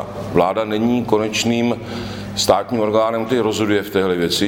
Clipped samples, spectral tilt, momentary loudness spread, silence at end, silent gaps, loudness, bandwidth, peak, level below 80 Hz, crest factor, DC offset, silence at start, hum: under 0.1%; -4.5 dB/octave; 5 LU; 0 s; none; -18 LUFS; 17 kHz; 0 dBFS; -46 dBFS; 18 dB; under 0.1%; 0 s; none